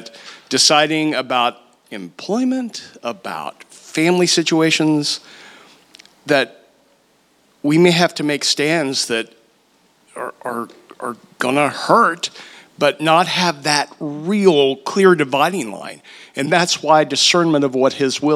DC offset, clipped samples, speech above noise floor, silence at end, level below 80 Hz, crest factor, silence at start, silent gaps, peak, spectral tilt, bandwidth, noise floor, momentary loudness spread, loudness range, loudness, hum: under 0.1%; under 0.1%; 41 dB; 0 s; -72 dBFS; 18 dB; 0 s; none; 0 dBFS; -3.5 dB/octave; 15 kHz; -57 dBFS; 17 LU; 5 LU; -16 LUFS; none